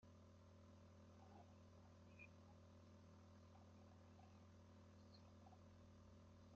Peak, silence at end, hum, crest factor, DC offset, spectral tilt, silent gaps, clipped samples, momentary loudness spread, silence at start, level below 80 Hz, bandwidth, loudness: -52 dBFS; 0 s; none; 14 dB; under 0.1%; -6 dB/octave; none; under 0.1%; 3 LU; 0 s; -84 dBFS; 7.2 kHz; -67 LUFS